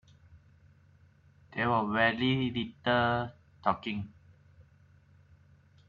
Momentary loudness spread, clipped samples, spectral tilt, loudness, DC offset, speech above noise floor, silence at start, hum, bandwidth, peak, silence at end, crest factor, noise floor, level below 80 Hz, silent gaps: 14 LU; under 0.1%; -8 dB/octave; -30 LUFS; under 0.1%; 32 dB; 0.3 s; none; 7 kHz; -12 dBFS; 1.25 s; 22 dB; -61 dBFS; -64 dBFS; none